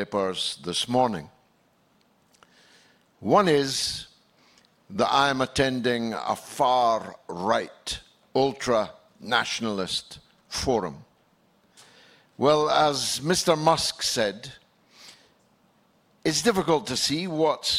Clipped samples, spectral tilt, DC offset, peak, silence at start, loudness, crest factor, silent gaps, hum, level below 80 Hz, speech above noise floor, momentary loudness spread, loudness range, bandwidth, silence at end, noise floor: under 0.1%; -3.5 dB/octave; under 0.1%; -6 dBFS; 0 s; -25 LUFS; 22 dB; none; none; -56 dBFS; 40 dB; 14 LU; 4 LU; 16.5 kHz; 0 s; -64 dBFS